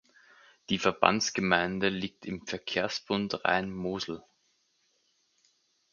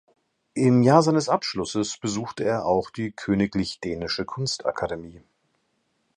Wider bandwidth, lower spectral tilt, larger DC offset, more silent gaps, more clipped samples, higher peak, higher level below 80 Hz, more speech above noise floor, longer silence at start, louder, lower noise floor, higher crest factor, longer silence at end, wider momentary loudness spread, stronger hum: second, 7.4 kHz vs 10.5 kHz; second, -4 dB/octave vs -5.5 dB/octave; neither; neither; neither; about the same, -4 dBFS vs -2 dBFS; second, -62 dBFS vs -54 dBFS; second, 43 dB vs 48 dB; first, 0.7 s vs 0.55 s; second, -30 LUFS vs -24 LUFS; about the same, -73 dBFS vs -72 dBFS; first, 28 dB vs 22 dB; first, 1.7 s vs 1 s; about the same, 12 LU vs 13 LU; neither